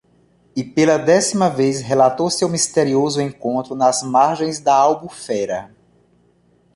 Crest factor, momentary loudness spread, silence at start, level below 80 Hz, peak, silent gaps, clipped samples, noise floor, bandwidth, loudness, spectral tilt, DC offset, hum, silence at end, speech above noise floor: 16 dB; 10 LU; 0.55 s; -58 dBFS; -2 dBFS; none; under 0.1%; -57 dBFS; 11.5 kHz; -17 LUFS; -4.5 dB/octave; under 0.1%; none; 1.1 s; 40 dB